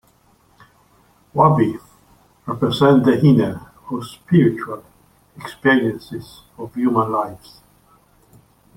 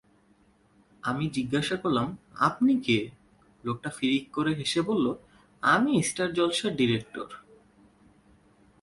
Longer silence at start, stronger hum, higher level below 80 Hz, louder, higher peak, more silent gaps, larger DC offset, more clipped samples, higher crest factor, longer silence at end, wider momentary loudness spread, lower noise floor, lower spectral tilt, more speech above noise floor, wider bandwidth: first, 1.35 s vs 1.05 s; neither; first, -54 dBFS vs -62 dBFS; first, -17 LUFS vs -27 LUFS; first, -2 dBFS vs -10 dBFS; neither; neither; neither; about the same, 18 dB vs 20 dB; about the same, 1.4 s vs 1.4 s; first, 21 LU vs 14 LU; second, -56 dBFS vs -63 dBFS; first, -8 dB/octave vs -4.5 dB/octave; about the same, 39 dB vs 36 dB; first, 15.5 kHz vs 11.5 kHz